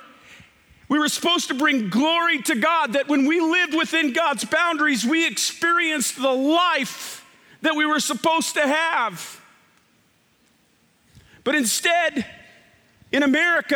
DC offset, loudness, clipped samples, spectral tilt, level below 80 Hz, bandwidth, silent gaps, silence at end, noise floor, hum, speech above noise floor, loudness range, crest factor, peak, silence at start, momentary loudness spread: under 0.1%; -20 LUFS; under 0.1%; -2 dB/octave; -68 dBFS; 18.5 kHz; none; 0 s; -61 dBFS; none; 41 dB; 6 LU; 16 dB; -6 dBFS; 0.3 s; 7 LU